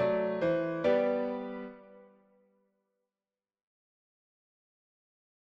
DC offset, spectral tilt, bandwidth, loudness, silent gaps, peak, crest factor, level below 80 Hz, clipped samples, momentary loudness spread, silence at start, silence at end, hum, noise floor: under 0.1%; -8 dB/octave; 6.8 kHz; -31 LUFS; none; -16 dBFS; 18 dB; -72 dBFS; under 0.1%; 14 LU; 0 s; 3.4 s; none; under -90 dBFS